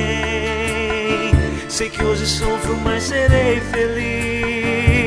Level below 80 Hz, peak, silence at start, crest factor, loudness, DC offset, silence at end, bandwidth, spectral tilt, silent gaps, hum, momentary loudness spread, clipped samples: -26 dBFS; 0 dBFS; 0 s; 18 dB; -18 LUFS; under 0.1%; 0 s; 11 kHz; -5 dB/octave; none; none; 5 LU; under 0.1%